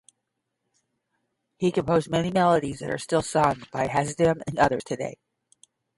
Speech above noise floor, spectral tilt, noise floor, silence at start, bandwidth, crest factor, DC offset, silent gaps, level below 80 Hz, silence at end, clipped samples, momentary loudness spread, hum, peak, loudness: 56 dB; -5.5 dB/octave; -80 dBFS; 1.6 s; 11.5 kHz; 20 dB; under 0.1%; none; -54 dBFS; 0.85 s; under 0.1%; 9 LU; none; -6 dBFS; -25 LUFS